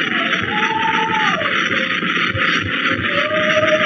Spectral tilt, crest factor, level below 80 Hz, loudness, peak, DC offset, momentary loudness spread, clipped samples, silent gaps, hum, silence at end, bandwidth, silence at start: -1.5 dB/octave; 14 dB; -52 dBFS; -16 LUFS; -2 dBFS; under 0.1%; 2 LU; under 0.1%; none; none; 0 s; 7.2 kHz; 0 s